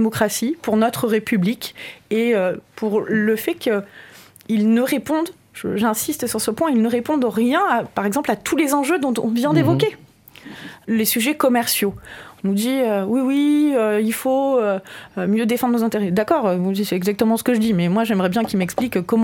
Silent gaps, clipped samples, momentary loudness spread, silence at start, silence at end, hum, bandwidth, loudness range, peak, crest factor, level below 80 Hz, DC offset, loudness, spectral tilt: none; under 0.1%; 8 LU; 0 s; 0 s; none; 17.5 kHz; 2 LU; -2 dBFS; 16 dB; -58 dBFS; under 0.1%; -19 LUFS; -5 dB/octave